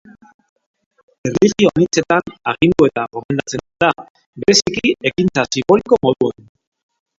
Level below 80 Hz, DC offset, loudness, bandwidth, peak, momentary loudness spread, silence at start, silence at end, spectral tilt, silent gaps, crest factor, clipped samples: -48 dBFS; under 0.1%; -16 LUFS; 7.8 kHz; 0 dBFS; 9 LU; 1.25 s; 0.9 s; -4.5 dB/octave; 3.25-3.29 s, 4.10-4.15 s, 4.26-4.33 s; 16 dB; under 0.1%